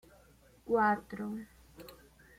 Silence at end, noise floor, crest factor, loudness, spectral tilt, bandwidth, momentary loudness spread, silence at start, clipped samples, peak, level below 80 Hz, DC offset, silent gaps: 0.45 s; -62 dBFS; 18 dB; -33 LUFS; -6.5 dB/octave; 16.5 kHz; 25 LU; 0.65 s; under 0.1%; -18 dBFS; -64 dBFS; under 0.1%; none